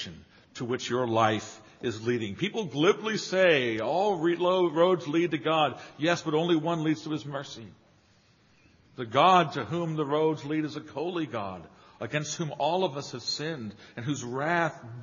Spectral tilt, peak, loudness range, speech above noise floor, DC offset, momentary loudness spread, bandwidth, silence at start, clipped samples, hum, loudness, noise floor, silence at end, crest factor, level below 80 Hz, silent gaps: -4 dB/octave; -8 dBFS; 6 LU; 35 dB; under 0.1%; 14 LU; 7.2 kHz; 0 s; under 0.1%; none; -28 LUFS; -63 dBFS; 0 s; 22 dB; -70 dBFS; none